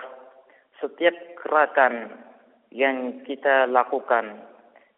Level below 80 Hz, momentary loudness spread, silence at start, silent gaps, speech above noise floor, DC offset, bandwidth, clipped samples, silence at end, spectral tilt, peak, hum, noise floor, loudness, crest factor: -78 dBFS; 18 LU; 0 s; none; 32 dB; under 0.1%; 4 kHz; under 0.1%; 0.55 s; 0 dB/octave; -4 dBFS; none; -54 dBFS; -22 LUFS; 20 dB